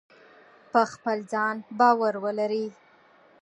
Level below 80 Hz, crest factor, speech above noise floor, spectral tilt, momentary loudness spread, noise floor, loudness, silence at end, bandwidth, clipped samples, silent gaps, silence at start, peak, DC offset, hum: -80 dBFS; 20 dB; 33 dB; -5 dB/octave; 9 LU; -57 dBFS; -25 LUFS; 0.7 s; 10 kHz; under 0.1%; none; 0.75 s; -6 dBFS; under 0.1%; none